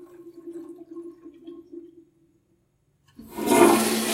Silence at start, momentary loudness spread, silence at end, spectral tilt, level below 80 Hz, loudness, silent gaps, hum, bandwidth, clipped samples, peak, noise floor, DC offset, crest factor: 0.25 s; 28 LU; 0 s; -3.5 dB/octave; -64 dBFS; -19 LUFS; none; none; 16 kHz; under 0.1%; -2 dBFS; -68 dBFS; under 0.1%; 24 dB